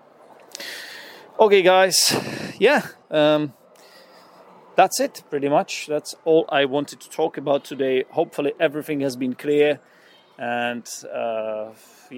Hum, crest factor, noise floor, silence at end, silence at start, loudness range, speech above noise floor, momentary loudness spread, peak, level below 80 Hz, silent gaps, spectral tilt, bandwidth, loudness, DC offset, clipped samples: none; 20 dB; -49 dBFS; 0 s; 0.6 s; 5 LU; 29 dB; 17 LU; -2 dBFS; -74 dBFS; none; -3 dB/octave; 17 kHz; -21 LUFS; under 0.1%; under 0.1%